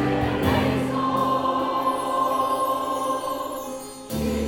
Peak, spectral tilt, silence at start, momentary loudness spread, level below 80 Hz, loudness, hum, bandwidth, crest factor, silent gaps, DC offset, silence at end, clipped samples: -8 dBFS; -5.5 dB/octave; 0 s; 9 LU; -42 dBFS; -24 LUFS; none; 18 kHz; 16 dB; none; under 0.1%; 0 s; under 0.1%